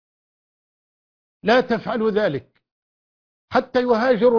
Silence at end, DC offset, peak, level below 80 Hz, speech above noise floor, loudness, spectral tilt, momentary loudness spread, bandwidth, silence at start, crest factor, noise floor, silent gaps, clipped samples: 0 s; under 0.1%; -4 dBFS; -58 dBFS; over 72 dB; -20 LUFS; -6.5 dB/octave; 6 LU; 5.4 kHz; 1.45 s; 18 dB; under -90 dBFS; 2.72-3.48 s; under 0.1%